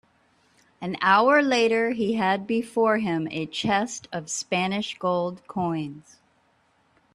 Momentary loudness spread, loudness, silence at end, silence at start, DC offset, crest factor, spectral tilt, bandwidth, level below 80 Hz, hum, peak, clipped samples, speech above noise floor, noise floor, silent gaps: 12 LU; -24 LUFS; 1.15 s; 0.8 s; under 0.1%; 20 dB; -4.5 dB/octave; 12 kHz; -66 dBFS; none; -6 dBFS; under 0.1%; 41 dB; -65 dBFS; none